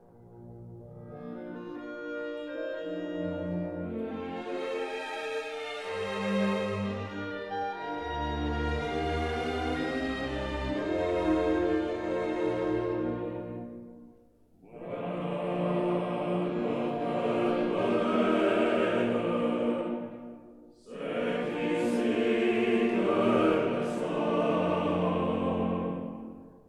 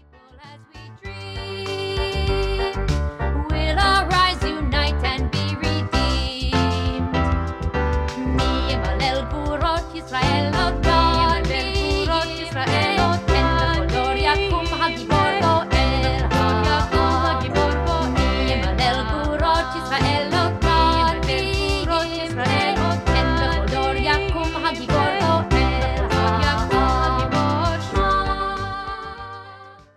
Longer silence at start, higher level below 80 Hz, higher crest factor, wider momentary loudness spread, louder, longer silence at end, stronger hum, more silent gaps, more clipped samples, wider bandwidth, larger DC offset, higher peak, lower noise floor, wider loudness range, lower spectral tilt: second, 0.15 s vs 0.35 s; second, -48 dBFS vs -26 dBFS; about the same, 18 dB vs 16 dB; first, 14 LU vs 7 LU; second, -30 LUFS vs -20 LUFS; about the same, 0.1 s vs 0.2 s; neither; neither; neither; about the same, 12 kHz vs 12 kHz; neither; second, -12 dBFS vs -4 dBFS; first, -61 dBFS vs -46 dBFS; first, 8 LU vs 3 LU; first, -7 dB/octave vs -5.5 dB/octave